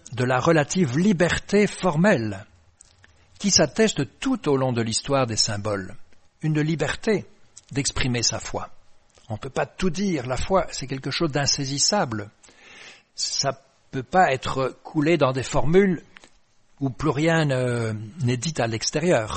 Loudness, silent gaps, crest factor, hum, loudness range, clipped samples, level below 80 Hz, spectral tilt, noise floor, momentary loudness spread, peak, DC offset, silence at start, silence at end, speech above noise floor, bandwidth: -23 LUFS; none; 20 dB; none; 4 LU; under 0.1%; -44 dBFS; -4.5 dB/octave; -57 dBFS; 12 LU; -2 dBFS; under 0.1%; 0.1 s; 0 s; 34 dB; 8.8 kHz